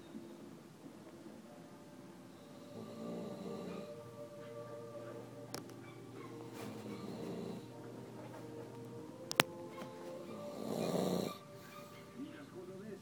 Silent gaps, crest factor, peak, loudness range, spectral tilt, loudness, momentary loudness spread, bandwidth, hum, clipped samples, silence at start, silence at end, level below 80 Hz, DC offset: none; 44 dB; -2 dBFS; 10 LU; -4 dB/octave; -45 LUFS; 17 LU; 19 kHz; none; under 0.1%; 0 s; 0 s; -80 dBFS; under 0.1%